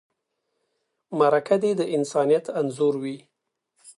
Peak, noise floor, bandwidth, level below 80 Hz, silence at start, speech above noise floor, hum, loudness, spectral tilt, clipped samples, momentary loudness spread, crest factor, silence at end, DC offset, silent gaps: -6 dBFS; -77 dBFS; 11.5 kHz; -78 dBFS; 1.1 s; 55 dB; none; -23 LUFS; -6 dB/octave; under 0.1%; 12 LU; 18 dB; 0.1 s; under 0.1%; none